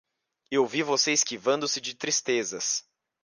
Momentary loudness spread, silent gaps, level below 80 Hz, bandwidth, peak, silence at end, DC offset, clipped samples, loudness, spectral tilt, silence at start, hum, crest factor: 7 LU; none; -76 dBFS; 11 kHz; -10 dBFS; 0.45 s; under 0.1%; under 0.1%; -26 LUFS; -1.5 dB/octave; 0.5 s; none; 18 dB